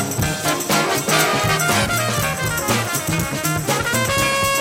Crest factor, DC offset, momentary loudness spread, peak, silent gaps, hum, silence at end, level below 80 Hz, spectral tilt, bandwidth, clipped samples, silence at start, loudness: 16 dB; under 0.1%; 4 LU; -4 dBFS; none; none; 0 s; -40 dBFS; -3 dB/octave; 16.5 kHz; under 0.1%; 0 s; -18 LUFS